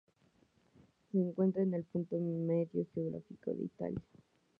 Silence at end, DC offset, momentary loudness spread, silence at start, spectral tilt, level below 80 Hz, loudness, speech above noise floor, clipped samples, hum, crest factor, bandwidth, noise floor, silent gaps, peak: 0.6 s; under 0.1%; 9 LU; 1.15 s; -12 dB/octave; -70 dBFS; -37 LUFS; 35 dB; under 0.1%; none; 18 dB; 3.2 kHz; -71 dBFS; none; -20 dBFS